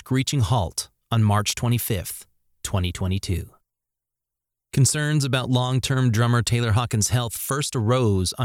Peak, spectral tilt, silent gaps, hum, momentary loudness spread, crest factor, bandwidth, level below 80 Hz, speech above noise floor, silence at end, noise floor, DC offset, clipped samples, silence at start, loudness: -8 dBFS; -5 dB/octave; none; none; 8 LU; 16 dB; 17 kHz; -44 dBFS; 64 dB; 0 s; -85 dBFS; under 0.1%; under 0.1%; 0.05 s; -22 LUFS